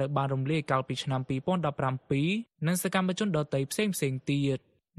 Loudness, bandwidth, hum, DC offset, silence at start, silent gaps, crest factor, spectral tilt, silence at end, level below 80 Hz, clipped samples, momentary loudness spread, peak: -30 LUFS; 13 kHz; none; under 0.1%; 0 s; none; 18 dB; -5.5 dB/octave; 0.4 s; -64 dBFS; under 0.1%; 3 LU; -12 dBFS